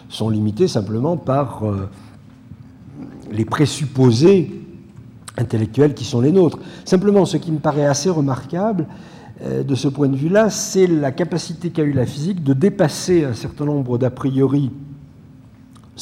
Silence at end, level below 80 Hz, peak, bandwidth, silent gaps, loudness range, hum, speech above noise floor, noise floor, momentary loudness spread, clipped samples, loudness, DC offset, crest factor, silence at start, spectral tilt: 0 s; -52 dBFS; -4 dBFS; 15 kHz; none; 4 LU; none; 26 dB; -44 dBFS; 16 LU; under 0.1%; -18 LUFS; under 0.1%; 14 dB; 0.1 s; -6.5 dB/octave